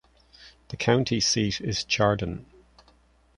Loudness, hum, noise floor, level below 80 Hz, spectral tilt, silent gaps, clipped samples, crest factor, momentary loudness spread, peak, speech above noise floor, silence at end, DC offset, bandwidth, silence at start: -25 LUFS; none; -60 dBFS; -50 dBFS; -4 dB/octave; none; under 0.1%; 22 dB; 12 LU; -6 dBFS; 35 dB; 0.95 s; under 0.1%; 11 kHz; 0.4 s